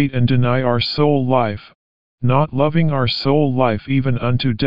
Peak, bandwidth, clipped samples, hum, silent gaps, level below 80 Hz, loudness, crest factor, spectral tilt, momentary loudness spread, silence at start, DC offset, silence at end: -2 dBFS; 5.4 kHz; under 0.1%; none; 1.75-2.18 s; -44 dBFS; -17 LUFS; 16 dB; -6 dB/octave; 3 LU; 0 s; 3%; 0 s